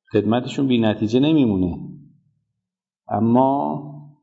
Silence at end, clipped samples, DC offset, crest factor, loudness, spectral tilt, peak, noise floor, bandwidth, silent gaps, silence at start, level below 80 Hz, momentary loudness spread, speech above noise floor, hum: 0.15 s; under 0.1%; under 0.1%; 16 dB; -19 LUFS; -8 dB/octave; -4 dBFS; -84 dBFS; 8 kHz; none; 0.15 s; -52 dBFS; 15 LU; 66 dB; none